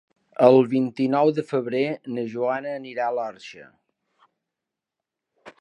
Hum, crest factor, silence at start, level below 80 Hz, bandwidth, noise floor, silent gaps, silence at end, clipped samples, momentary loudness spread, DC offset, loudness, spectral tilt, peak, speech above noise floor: none; 22 dB; 0.4 s; -76 dBFS; 9.4 kHz; -86 dBFS; none; 0.1 s; under 0.1%; 16 LU; under 0.1%; -22 LUFS; -7.5 dB/octave; -2 dBFS; 64 dB